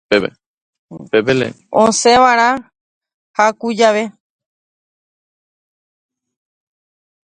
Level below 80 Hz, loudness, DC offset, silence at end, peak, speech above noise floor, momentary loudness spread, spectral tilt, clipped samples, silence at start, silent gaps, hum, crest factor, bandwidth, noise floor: -54 dBFS; -14 LUFS; under 0.1%; 3.2 s; 0 dBFS; over 77 dB; 13 LU; -3.5 dB/octave; under 0.1%; 0.1 s; 0.46-0.88 s, 2.81-3.01 s, 3.14-3.34 s; none; 18 dB; 10.5 kHz; under -90 dBFS